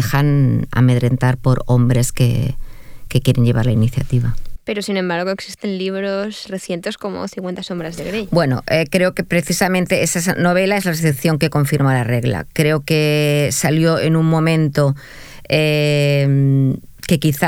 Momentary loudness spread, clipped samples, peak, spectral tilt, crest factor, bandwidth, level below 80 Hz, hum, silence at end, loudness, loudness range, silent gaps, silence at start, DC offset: 10 LU; under 0.1%; 0 dBFS; -6 dB/octave; 16 dB; 17 kHz; -36 dBFS; none; 0 s; -17 LUFS; 6 LU; none; 0 s; under 0.1%